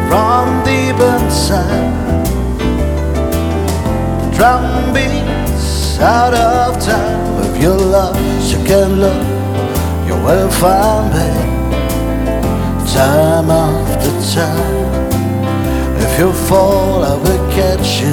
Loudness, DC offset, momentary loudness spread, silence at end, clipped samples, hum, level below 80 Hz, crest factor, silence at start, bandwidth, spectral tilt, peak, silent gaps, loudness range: -13 LUFS; under 0.1%; 6 LU; 0 s; under 0.1%; none; -22 dBFS; 12 dB; 0 s; 19.5 kHz; -5.5 dB/octave; 0 dBFS; none; 2 LU